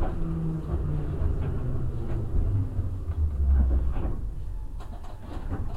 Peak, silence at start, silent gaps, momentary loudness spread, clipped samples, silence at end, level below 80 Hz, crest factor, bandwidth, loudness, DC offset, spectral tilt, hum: -12 dBFS; 0 s; none; 15 LU; under 0.1%; 0 s; -28 dBFS; 14 dB; 4.2 kHz; -30 LUFS; 0.4%; -9.5 dB/octave; none